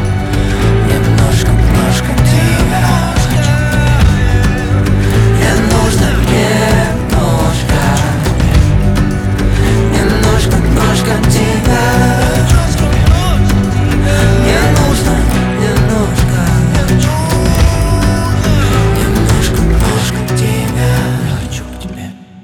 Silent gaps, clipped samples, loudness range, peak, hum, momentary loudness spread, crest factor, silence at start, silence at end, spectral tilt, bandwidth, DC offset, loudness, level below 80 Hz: none; under 0.1%; 1 LU; 0 dBFS; none; 3 LU; 10 dB; 0 s; 0 s; -5.5 dB/octave; 17.5 kHz; under 0.1%; -11 LUFS; -16 dBFS